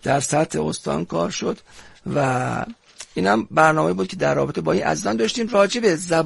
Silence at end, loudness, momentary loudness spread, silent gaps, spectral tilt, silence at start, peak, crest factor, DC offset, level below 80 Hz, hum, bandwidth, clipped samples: 0 s; -21 LUFS; 12 LU; none; -5 dB/octave; 0.05 s; -2 dBFS; 20 dB; 0.2%; -54 dBFS; none; 11.5 kHz; under 0.1%